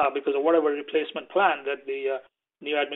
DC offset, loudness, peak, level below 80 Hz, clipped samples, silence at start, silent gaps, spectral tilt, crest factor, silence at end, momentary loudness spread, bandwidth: under 0.1%; -26 LUFS; -6 dBFS; -74 dBFS; under 0.1%; 0 s; none; -6.5 dB/octave; 20 dB; 0 s; 9 LU; 4.1 kHz